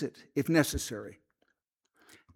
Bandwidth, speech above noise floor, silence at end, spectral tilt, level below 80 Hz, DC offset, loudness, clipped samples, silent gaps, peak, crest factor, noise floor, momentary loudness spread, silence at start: 18 kHz; 48 dB; 1.2 s; -5 dB/octave; -52 dBFS; under 0.1%; -30 LUFS; under 0.1%; none; -12 dBFS; 22 dB; -79 dBFS; 16 LU; 0 s